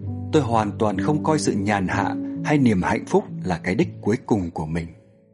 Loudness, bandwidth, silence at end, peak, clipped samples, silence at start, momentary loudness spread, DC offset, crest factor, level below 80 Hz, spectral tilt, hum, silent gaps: -22 LUFS; 11.5 kHz; 0.4 s; -4 dBFS; under 0.1%; 0 s; 8 LU; under 0.1%; 18 dB; -48 dBFS; -6.5 dB/octave; none; none